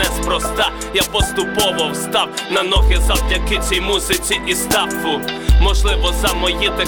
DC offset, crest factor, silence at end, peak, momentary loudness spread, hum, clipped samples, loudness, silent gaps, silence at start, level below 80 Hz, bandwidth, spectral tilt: under 0.1%; 14 dB; 0 s; -2 dBFS; 4 LU; none; under 0.1%; -16 LUFS; none; 0 s; -20 dBFS; 20 kHz; -3 dB/octave